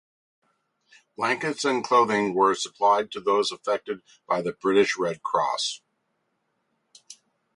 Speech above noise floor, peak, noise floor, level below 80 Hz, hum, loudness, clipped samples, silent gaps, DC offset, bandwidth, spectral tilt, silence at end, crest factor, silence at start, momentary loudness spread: 51 dB; -6 dBFS; -75 dBFS; -72 dBFS; none; -24 LUFS; under 0.1%; none; under 0.1%; 11.5 kHz; -3.5 dB/octave; 0.4 s; 20 dB; 1.2 s; 8 LU